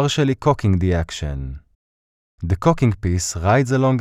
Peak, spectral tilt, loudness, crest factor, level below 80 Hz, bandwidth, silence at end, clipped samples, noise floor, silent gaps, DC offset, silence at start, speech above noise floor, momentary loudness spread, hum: -2 dBFS; -6 dB/octave; -19 LUFS; 16 dB; -34 dBFS; 14 kHz; 0 s; under 0.1%; under -90 dBFS; 1.75-2.38 s; under 0.1%; 0 s; over 72 dB; 13 LU; none